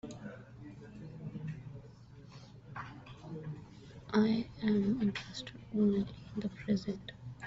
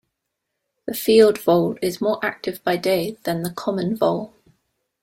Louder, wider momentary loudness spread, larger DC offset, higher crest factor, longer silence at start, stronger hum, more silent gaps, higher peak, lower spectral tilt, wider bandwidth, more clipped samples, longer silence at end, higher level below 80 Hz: second, -36 LUFS vs -21 LUFS; first, 21 LU vs 12 LU; neither; about the same, 20 dB vs 20 dB; second, 0.05 s vs 0.85 s; neither; neither; second, -16 dBFS vs -2 dBFS; about the same, -6.5 dB/octave vs -5.5 dB/octave; second, 7.8 kHz vs 16.5 kHz; neither; second, 0 s vs 0.75 s; about the same, -62 dBFS vs -60 dBFS